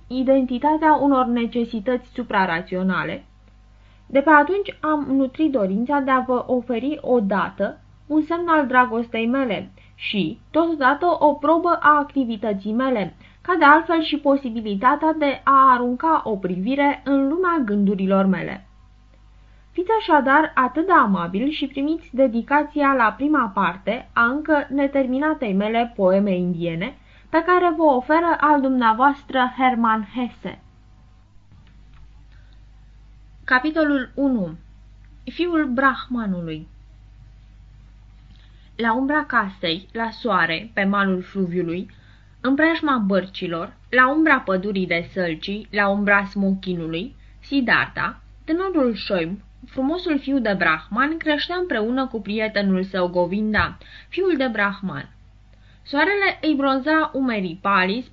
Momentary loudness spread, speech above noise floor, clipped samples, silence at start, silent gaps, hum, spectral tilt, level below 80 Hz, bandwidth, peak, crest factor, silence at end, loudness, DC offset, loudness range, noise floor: 11 LU; 30 dB; under 0.1%; 0.1 s; none; none; -8 dB/octave; -48 dBFS; 6 kHz; -2 dBFS; 20 dB; 0.1 s; -20 LUFS; under 0.1%; 6 LU; -49 dBFS